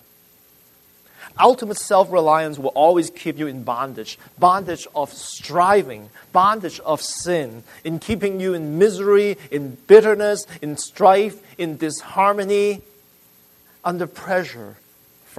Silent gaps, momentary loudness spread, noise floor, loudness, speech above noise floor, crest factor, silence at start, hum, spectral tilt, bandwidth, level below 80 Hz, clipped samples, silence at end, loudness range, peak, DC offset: none; 14 LU; -53 dBFS; -19 LUFS; 34 dB; 20 dB; 1.2 s; none; -4.5 dB/octave; 13.5 kHz; -56 dBFS; under 0.1%; 0.65 s; 5 LU; 0 dBFS; under 0.1%